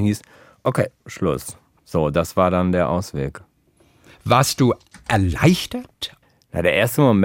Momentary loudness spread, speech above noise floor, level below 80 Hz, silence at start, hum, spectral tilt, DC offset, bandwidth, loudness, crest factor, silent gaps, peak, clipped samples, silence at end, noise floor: 13 LU; 38 dB; -44 dBFS; 0 s; none; -5.5 dB/octave; under 0.1%; 17 kHz; -20 LUFS; 18 dB; none; -2 dBFS; under 0.1%; 0 s; -58 dBFS